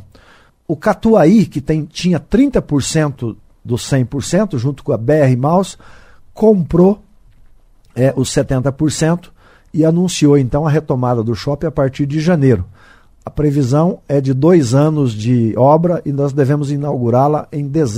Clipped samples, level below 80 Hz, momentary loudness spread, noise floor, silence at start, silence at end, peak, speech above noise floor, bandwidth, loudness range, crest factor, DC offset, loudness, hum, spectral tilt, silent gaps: under 0.1%; -38 dBFS; 8 LU; -47 dBFS; 0.7 s; 0 s; 0 dBFS; 34 dB; 15 kHz; 3 LU; 14 dB; under 0.1%; -14 LUFS; none; -7 dB/octave; none